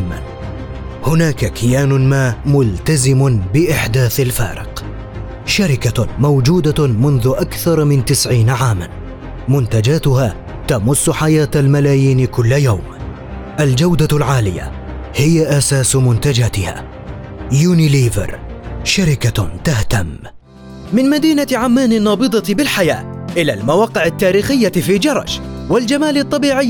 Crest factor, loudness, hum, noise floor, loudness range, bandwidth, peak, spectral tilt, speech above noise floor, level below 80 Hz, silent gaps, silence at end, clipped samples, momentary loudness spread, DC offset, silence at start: 10 dB; -14 LUFS; none; -34 dBFS; 2 LU; 18 kHz; -2 dBFS; -5.5 dB/octave; 21 dB; -32 dBFS; none; 0 s; under 0.1%; 15 LU; under 0.1%; 0 s